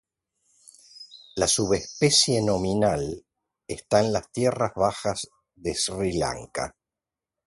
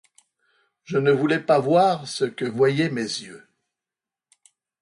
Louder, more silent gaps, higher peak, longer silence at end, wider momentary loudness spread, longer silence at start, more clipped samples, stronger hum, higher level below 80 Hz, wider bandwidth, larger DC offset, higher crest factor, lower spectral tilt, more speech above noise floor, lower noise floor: about the same, -24 LUFS vs -22 LUFS; neither; about the same, -6 dBFS vs -6 dBFS; second, 0.75 s vs 1.45 s; first, 18 LU vs 10 LU; about the same, 0.95 s vs 0.9 s; neither; neither; first, -50 dBFS vs -68 dBFS; about the same, 12 kHz vs 11 kHz; neither; first, 22 dB vs 16 dB; second, -3.5 dB/octave vs -5.5 dB/octave; second, 65 dB vs 69 dB; about the same, -89 dBFS vs -90 dBFS